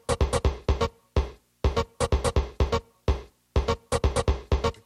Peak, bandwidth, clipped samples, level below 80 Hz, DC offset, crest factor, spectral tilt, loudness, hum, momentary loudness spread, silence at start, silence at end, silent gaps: -12 dBFS; 12 kHz; under 0.1%; -30 dBFS; under 0.1%; 14 dB; -5.5 dB/octave; -28 LUFS; none; 5 LU; 0.1 s; 0.15 s; none